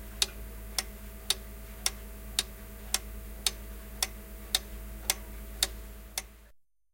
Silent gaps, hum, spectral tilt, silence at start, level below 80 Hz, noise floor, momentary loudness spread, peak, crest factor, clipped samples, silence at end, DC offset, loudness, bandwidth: none; none; -1 dB/octave; 0 s; -44 dBFS; -60 dBFS; 13 LU; -4 dBFS; 32 dB; under 0.1%; 0.3 s; under 0.1%; -33 LUFS; 17 kHz